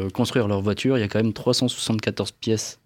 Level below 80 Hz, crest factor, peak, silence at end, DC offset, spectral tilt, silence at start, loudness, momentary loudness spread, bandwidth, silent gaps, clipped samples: -58 dBFS; 16 dB; -8 dBFS; 0.1 s; under 0.1%; -5 dB/octave; 0 s; -23 LUFS; 4 LU; 16.5 kHz; none; under 0.1%